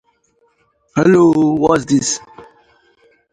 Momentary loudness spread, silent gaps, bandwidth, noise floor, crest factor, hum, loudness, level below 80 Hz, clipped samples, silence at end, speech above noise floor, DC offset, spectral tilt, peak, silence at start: 11 LU; none; 9.6 kHz; -60 dBFS; 16 dB; none; -14 LUFS; -50 dBFS; under 0.1%; 0.9 s; 47 dB; under 0.1%; -5.5 dB/octave; 0 dBFS; 0.95 s